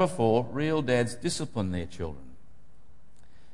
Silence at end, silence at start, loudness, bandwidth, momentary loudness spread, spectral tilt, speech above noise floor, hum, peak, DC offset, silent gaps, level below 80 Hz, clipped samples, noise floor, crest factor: 1.2 s; 0 s; -29 LUFS; 11.5 kHz; 13 LU; -5.5 dB/octave; 32 dB; none; -10 dBFS; 1%; none; -56 dBFS; under 0.1%; -60 dBFS; 20 dB